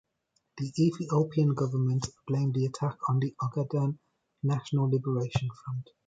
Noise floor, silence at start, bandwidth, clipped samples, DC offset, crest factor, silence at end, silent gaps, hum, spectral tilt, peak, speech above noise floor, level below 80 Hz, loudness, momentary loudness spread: -76 dBFS; 0.55 s; 9.2 kHz; under 0.1%; under 0.1%; 16 dB; 0.25 s; none; none; -7.5 dB/octave; -14 dBFS; 48 dB; -60 dBFS; -30 LUFS; 8 LU